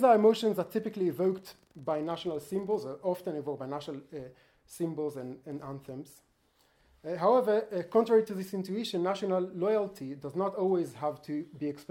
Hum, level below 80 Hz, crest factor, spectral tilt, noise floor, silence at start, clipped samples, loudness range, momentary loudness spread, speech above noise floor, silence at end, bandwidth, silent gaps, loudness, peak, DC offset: none; -72 dBFS; 20 dB; -6.5 dB/octave; -69 dBFS; 0 s; under 0.1%; 10 LU; 17 LU; 39 dB; 0.1 s; 17 kHz; none; -31 LUFS; -12 dBFS; under 0.1%